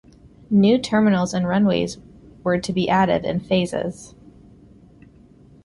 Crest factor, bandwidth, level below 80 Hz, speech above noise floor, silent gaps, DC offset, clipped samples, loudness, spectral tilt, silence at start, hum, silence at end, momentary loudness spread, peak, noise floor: 16 dB; 11.5 kHz; -50 dBFS; 30 dB; none; under 0.1%; under 0.1%; -20 LUFS; -6.5 dB/octave; 0.5 s; none; 1.6 s; 12 LU; -6 dBFS; -49 dBFS